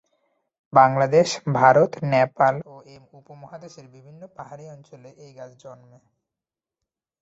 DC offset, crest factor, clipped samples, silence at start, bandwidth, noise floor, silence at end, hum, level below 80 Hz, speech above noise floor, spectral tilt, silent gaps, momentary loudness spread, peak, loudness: under 0.1%; 22 dB; under 0.1%; 0.75 s; 8 kHz; -89 dBFS; 1.5 s; none; -66 dBFS; 67 dB; -5.5 dB/octave; none; 26 LU; -2 dBFS; -18 LUFS